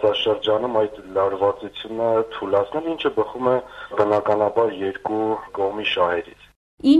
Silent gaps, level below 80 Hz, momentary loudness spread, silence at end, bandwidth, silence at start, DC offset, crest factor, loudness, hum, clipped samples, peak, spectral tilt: 6.56-6.78 s; -56 dBFS; 6 LU; 0 s; 11 kHz; 0 s; under 0.1%; 18 dB; -22 LUFS; none; under 0.1%; -4 dBFS; -6.5 dB/octave